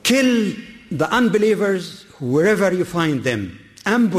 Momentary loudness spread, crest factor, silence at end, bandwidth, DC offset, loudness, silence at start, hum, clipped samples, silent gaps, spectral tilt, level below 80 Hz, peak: 14 LU; 12 dB; 0 s; 15 kHz; under 0.1%; -19 LUFS; 0.05 s; none; under 0.1%; none; -5 dB/octave; -54 dBFS; -6 dBFS